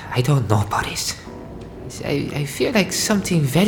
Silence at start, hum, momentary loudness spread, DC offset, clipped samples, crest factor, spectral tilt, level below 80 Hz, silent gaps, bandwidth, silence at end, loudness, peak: 0 s; none; 17 LU; under 0.1%; under 0.1%; 20 dB; -5 dB/octave; -44 dBFS; none; over 20 kHz; 0 s; -20 LUFS; 0 dBFS